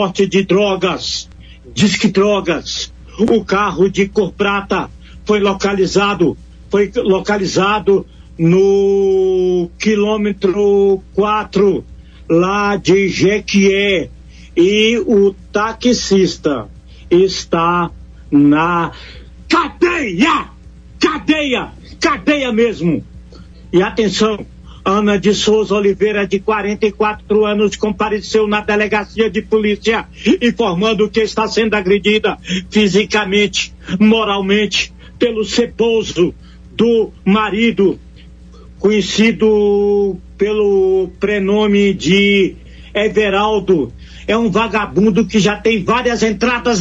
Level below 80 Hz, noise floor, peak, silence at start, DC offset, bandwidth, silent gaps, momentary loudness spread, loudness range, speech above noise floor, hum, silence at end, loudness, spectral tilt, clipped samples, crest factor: -38 dBFS; -37 dBFS; 0 dBFS; 0 s; under 0.1%; 8 kHz; none; 7 LU; 2 LU; 24 dB; none; 0 s; -14 LUFS; -5 dB/octave; under 0.1%; 14 dB